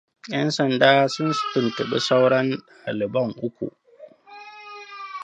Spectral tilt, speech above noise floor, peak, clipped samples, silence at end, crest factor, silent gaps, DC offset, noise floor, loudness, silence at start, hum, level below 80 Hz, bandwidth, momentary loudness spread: -5 dB/octave; 26 dB; -2 dBFS; under 0.1%; 0 s; 22 dB; none; under 0.1%; -48 dBFS; -22 LUFS; 0.25 s; none; -68 dBFS; 10 kHz; 22 LU